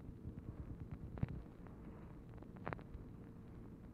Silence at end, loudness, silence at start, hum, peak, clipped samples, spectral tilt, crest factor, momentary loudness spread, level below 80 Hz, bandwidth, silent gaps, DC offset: 0 s; -52 LUFS; 0 s; none; -24 dBFS; under 0.1%; -9 dB/octave; 28 dB; 10 LU; -58 dBFS; 15 kHz; none; under 0.1%